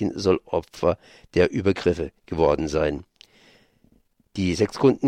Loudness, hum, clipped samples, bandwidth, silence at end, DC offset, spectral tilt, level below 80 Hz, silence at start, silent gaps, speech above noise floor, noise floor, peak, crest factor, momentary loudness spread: -24 LUFS; none; under 0.1%; 11.5 kHz; 0 s; under 0.1%; -6.5 dB/octave; -44 dBFS; 0 s; none; 40 dB; -62 dBFS; -6 dBFS; 18 dB; 9 LU